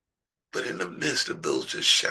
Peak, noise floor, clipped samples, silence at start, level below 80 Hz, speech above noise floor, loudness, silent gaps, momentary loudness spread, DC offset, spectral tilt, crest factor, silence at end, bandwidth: -6 dBFS; -88 dBFS; under 0.1%; 0.55 s; -76 dBFS; 62 dB; -27 LUFS; none; 12 LU; under 0.1%; -1.5 dB/octave; 22 dB; 0 s; 12.5 kHz